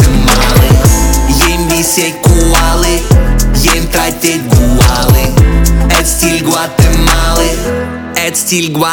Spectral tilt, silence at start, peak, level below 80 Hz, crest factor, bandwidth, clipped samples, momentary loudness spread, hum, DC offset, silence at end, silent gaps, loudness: -4 dB/octave; 0 s; 0 dBFS; -12 dBFS; 8 dB; over 20 kHz; 0.4%; 5 LU; none; under 0.1%; 0 s; none; -9 LUFS